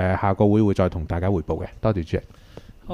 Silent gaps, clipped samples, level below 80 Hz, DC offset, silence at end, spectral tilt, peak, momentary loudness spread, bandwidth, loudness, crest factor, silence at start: none; under 0.1%; -38 dBFS; under 0.1%; 0 s; -9 dB/octave; -6 dBFS; 11 LU; 7.2 kHz; -22 LUFS; 16 dB; 0 s